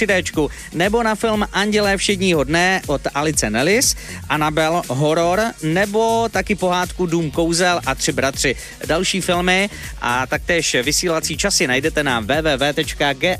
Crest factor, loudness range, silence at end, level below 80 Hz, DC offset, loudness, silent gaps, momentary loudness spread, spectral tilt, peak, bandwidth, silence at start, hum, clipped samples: 16 dB; 1 LU; 0 s; -36 dBFS; under 0.1%; -18 LUFS; none; 5 LU; -3.5 dB/octave; -2 dBFS; 15.5 kHz; 0 s; none; under 0.1%